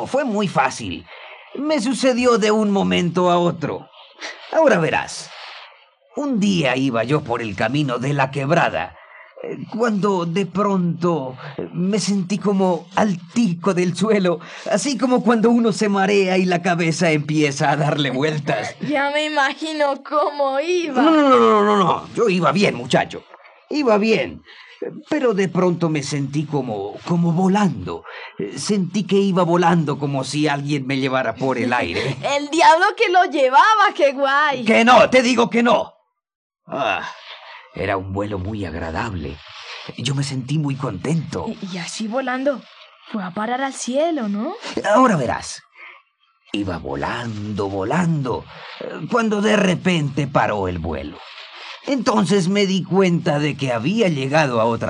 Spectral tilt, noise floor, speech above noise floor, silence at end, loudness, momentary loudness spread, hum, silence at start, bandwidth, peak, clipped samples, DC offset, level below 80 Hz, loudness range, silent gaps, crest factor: -5.5 dB/octave; -59 dBFS; 40 dB; 0 s; -19 LUFS; 15 LU; none; 0 s; 11 kHz; -2 dBFS; under 0.1%; under 0.1%; -54 dBFS; 8 LU; 36.35-36.50 s; 18 dB